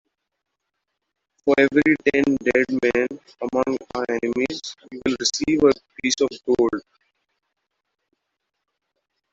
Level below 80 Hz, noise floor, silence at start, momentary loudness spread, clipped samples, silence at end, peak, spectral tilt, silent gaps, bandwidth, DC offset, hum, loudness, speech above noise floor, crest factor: -56 dBFS; -79 dBFS; 1.45 s; 10 LU; under 0.1%; 2.5 s; -4 dBFS; -3.5 dB/octave; none; 8 kHz; under 0.1%; none; -21 LUFS; 58 dB; 20 dB